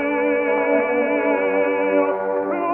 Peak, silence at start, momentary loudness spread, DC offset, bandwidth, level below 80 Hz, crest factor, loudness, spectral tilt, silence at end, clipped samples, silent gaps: -6 dBFS; 0 s; 3 LU; under 0.1%; 3.4 kHz; -62 dBFS; 12 dB; -19 LUFS; -9 dB/octave; 0 s; under 0.1%; none